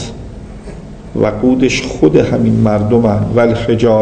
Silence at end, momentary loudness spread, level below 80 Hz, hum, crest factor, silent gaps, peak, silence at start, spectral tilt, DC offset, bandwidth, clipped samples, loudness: 0 s; 19 LU; -32 dBFS; none; 12 dB; none; 0 dBFS; 0 s; -7 dB/octave; under 0.1%; 9.4 kHz; 0.3%; -12 LUFS